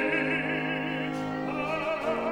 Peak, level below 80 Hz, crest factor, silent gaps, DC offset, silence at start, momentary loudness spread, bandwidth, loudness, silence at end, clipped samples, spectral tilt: -16 dBFS; -58 dBFS; 14 dB; none; under 0.1%; 0 s; 5 LU; 19.5 kHz; -29 LUFS; 0 s; under 0.1%; -6 dB/octave